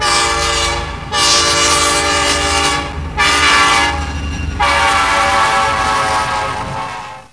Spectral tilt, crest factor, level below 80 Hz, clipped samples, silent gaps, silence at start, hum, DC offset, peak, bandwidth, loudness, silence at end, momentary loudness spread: -1.5 dB/octave; 14 dB; -28 dBFS; under 0.1%; none; 0 s; none; 0.4%; 0 dBFS; 11 kHz; -12 LUFS; 0.1 s; 12 LU